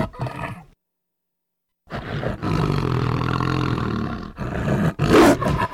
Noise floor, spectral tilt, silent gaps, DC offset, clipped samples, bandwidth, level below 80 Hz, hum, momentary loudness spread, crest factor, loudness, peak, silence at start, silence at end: -79 dBFS; -6.5 dB/octave; none; under 0.1%; under 0.1%; 16.5 kHz; -38 dBFS; none; 17 LU; 20 dB; -21 LUFS; -2 dBFS; 0 s; 0 s